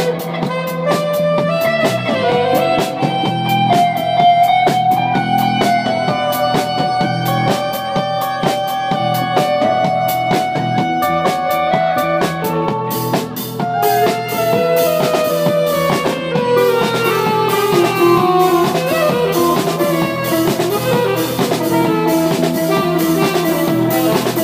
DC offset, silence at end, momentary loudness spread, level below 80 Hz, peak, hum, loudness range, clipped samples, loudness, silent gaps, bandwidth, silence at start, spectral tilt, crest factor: under 0.1%; 0 s; 5 LU; -50 dBFS; 0 dBFS; none; 3 LU; under 0.1%; -15 LUFS; none; 16 kHz; 0 s; -5 dB/octave; 14 dB